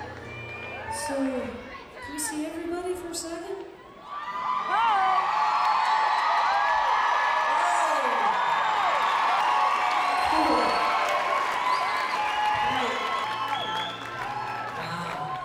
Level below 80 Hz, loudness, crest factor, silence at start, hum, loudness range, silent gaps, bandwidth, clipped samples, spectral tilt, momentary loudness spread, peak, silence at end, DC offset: -58 dBFS; -25 LUFS; 14 dB; 0 s; none; 9 LU; none; 16 kHz; under 0.1%; -2.5 dB/octave; 13 LU; -12 dBFS; 0 s; under 0.1%